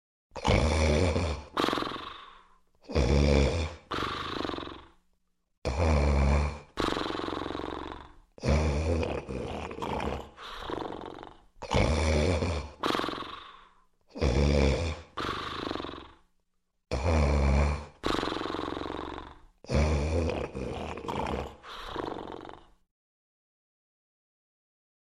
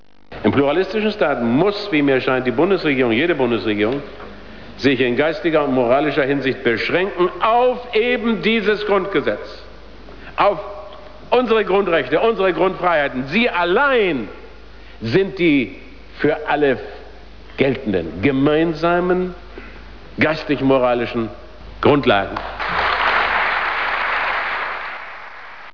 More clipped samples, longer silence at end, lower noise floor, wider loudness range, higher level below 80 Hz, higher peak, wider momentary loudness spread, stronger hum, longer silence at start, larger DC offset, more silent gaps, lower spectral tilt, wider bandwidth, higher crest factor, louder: neither; first, 2.45 s vs 0.05 s; first, -74 dBFS vs -40 dBFS; about the same, 5 LU vs 3 LU; first, -36 dBFS vs -44 dBFS; second, -10 dBFS vs -4 dBFS; about the same, 17 LU vs 17 LU; neither; about the same, 0.35 s vs 0.3 s; second, under 0.1% vs 1%; first, 5.58-5.62 s vs none; about the same, -6 dB/octave vs -7 dB/octave; first, 11.5 kHz vs 5.4 kHz; first, 22 dB vs 14 dB; second, -30 LUFS vs -18 LUFS